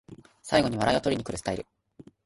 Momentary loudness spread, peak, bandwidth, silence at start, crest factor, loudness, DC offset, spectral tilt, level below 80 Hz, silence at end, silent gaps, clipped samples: 16 LU; -8 dBFS; 11.5 kHz; 0.1 s; 20 dB; -27 LUFS; under 0.1%; -5 dB/octave; -52 dBFS; 0.65 s; none; under 0.1%